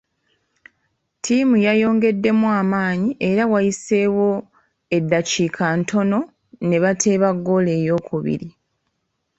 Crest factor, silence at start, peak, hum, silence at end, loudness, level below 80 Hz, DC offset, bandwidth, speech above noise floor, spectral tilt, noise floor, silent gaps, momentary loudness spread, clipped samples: 16 dB; 1.25 s; -4 dBFS; none; 0.9 s; -19 LUFS; -58 dBFS; under 0.1%; 8.2 kHz; 55 dB; -5.5 dB/octave; -73 dBFS; none; 8 LU; under 0.1%